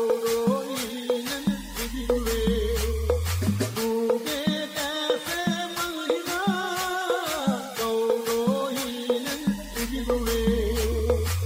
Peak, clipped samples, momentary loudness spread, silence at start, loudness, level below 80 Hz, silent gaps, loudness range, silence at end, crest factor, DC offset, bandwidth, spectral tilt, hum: -10 dBFS; under 0.1%; 4 LU; 0 s; -26 LUFS; -36 dBFS; none; 1 LU; 0 s; 16 dB; under 0.1%; 16 kHz; -4.5 dB/octave; none